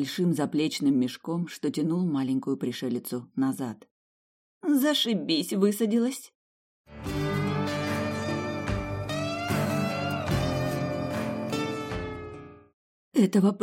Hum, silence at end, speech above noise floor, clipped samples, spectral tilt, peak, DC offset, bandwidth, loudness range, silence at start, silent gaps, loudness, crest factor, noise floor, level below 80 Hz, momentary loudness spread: none; 0 s; over 64 dB; under 0.1%; -5.5 dB/octave; -10 dBFS; under 0.1%; 16.5 kHz; 3 LU; 0 s; 3.91-4.61 s, 6.35-6.85 s, 12.73-13.12 s; -28 LUFS; 18 dB; under -90 dBFS; -50 dBFS; 10 LU